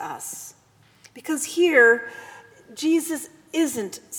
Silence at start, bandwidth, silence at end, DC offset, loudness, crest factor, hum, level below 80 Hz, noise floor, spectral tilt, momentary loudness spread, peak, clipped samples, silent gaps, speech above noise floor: 0 s; over 20 kHz; 0 s; under 0.1%; -21 LUFS; 20 dB; none; -74 dBFS; -54 dBFS; -2 dB/octave; 23 LU; -4 dBFS; under 0.1%; none; 32 dB